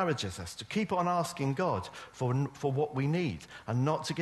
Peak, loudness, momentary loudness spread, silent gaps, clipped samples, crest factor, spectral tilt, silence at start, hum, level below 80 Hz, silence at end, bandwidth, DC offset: -16 dBFS; -32 LUFS; 7 LU; none; under 0.1%; 16 dB; -6 dB/octave; 0 s; none; -62 dBFS; 0 s; 12.5 kHz; under 0.1%